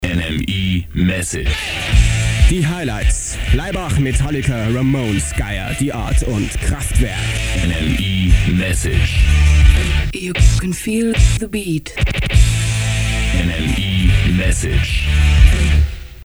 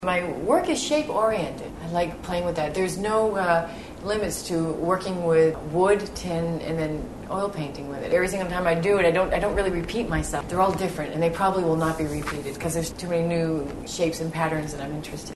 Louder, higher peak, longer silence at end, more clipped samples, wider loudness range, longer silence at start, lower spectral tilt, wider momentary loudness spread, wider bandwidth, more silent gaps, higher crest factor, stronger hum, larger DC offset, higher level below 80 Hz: first, -16 LUFS vs -25 LUFS; first, 0 dBFS vs -6 dBFS; about the same, 0 s vs 0 s; neither; about the same, 3 LU vs 2 LU; about the same, 0 s vs 0 s; about the same, -5 dB/octave vs -5.5 dB/octave; about the same, 7 LU vs 9 LU; first, over 20 kHz vs 12.5 kHz; neither; about the same, 14 dB vs 18 dB; neither; about the same, 0.3% vs 0.2%; first, -16 dBFS vs -42 dBFS